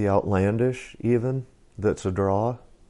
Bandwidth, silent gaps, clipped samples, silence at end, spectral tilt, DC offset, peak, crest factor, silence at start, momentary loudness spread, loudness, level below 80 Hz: 11.5 kHz; none; under 0.1%; 0.3 s; -8 dB/octave; under 0.1%; -8 dBFS; 16 dB; 0 s; 7 LU; -25 LUFS; -50 dBFS